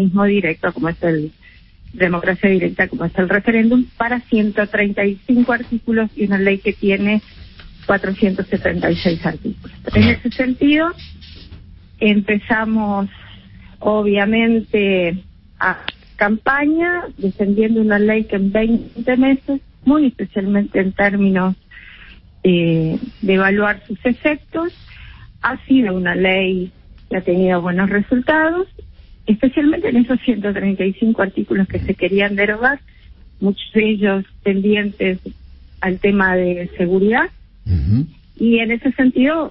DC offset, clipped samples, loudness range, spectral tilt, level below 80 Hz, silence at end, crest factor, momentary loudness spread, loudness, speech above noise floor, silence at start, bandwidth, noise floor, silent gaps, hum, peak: under 0.1%; under 0.1%; 2 LU; -11.5 dB/octave; -40 dBFS; 0 s; 16 dB; 8 LU; -17 LUFS; 27 dB; 0 s; 5.8 kHz; -43 dBFS; none; none; -2 dBFS